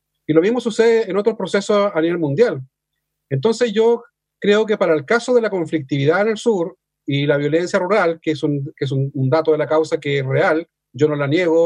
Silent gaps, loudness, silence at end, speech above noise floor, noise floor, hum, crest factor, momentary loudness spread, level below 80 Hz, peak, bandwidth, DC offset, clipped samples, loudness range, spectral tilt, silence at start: none; -18 LUFS; 0 s; 60 dB; -77 dBFS; none; 18 dB; 7 LU; -66 dBFS; 0 dBFS; 10.5 kHz; under 0.1%; under 0.1%; 1 LU; -6.5 dB/octave; 0.3 s